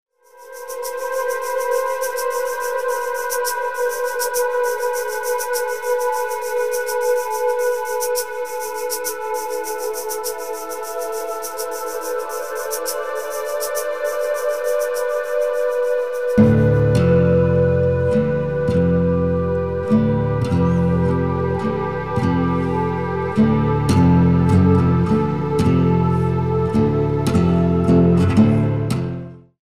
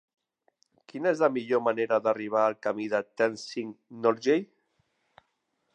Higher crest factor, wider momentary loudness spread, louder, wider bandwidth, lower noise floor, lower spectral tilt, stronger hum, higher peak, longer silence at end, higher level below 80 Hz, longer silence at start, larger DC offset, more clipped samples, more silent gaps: about the same, 16 dB vs 20 dB; about the same, 10 LU vs 11 LU; first, -19 LUFS vs -28 LUFS; first, 16 kHz vs 9.4 kHz; second, -41 dBFS vs -77 dBFS; about the same, -6.5 dB/octave vs -5.5 dB/octave; neither; first, -2 dBFS vs -8 dBFS; second, 0.05 s vs 1.3 s; first, -38 dBFS vs -82 dBFS; second, 0.05 s vs 0.95 s; first, 1% vs under 0.1%; neither; neither